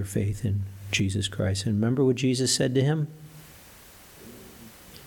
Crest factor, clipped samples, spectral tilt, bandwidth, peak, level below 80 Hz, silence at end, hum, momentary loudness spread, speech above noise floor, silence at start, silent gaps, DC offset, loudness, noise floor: 18 dB; under 0.1%; -5 dB/octave; 19 kHz; -10 dBFS; -54 dBFS; 0 s; none; 23 LU; 25 dB; 0 s; none; under 0.1%; -26 LUFS; -50 dBFS